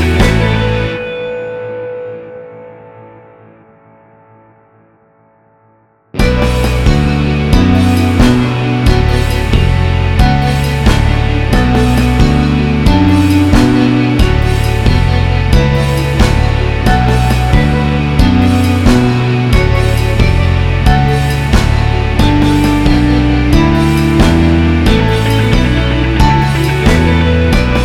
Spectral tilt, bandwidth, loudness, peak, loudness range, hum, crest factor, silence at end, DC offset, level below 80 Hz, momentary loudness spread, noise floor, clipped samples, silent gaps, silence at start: -6.5 dB/octave; 16 kHz; -11 LUFS; 0 dBFS; 7 LU; none; 10 dB; 0 s; under 0.1%; -16 dBFS; 4 LU; -50 dBFS; 0.3%; none; 0 s